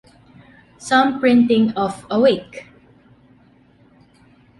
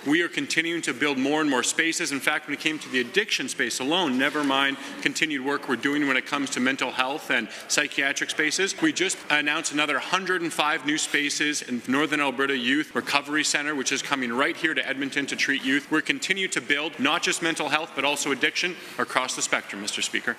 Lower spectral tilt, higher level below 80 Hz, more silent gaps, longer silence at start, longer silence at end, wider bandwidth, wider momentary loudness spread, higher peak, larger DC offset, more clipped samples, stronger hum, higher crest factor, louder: first, -5.5 dB/octave vs -2 dB/octave; first, -58 dBFS vs -76 dBFS; neither; first, 0.8 s vs 0 s; first, 1.95 s vs 0 s; second, 11.5 kHz vs 14.5 kHz; first, 22 LU vs 4 LU; about the same, -4 dBFS vs -2 dBFS; neither; neither; neither; second, 16 dB vs 24 dB; first, -17 LUFS vs -24 LUFS